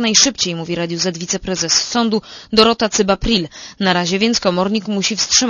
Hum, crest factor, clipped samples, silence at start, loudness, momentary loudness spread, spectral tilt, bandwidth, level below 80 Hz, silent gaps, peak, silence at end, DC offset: none; 16 dB; under 0.1%; 0 s; -16 LUFS; 8 LU; -2.5 dB/octave; 11 kHz; -38 dBFS; none; 0 dBFS; 0 s; under 0.1%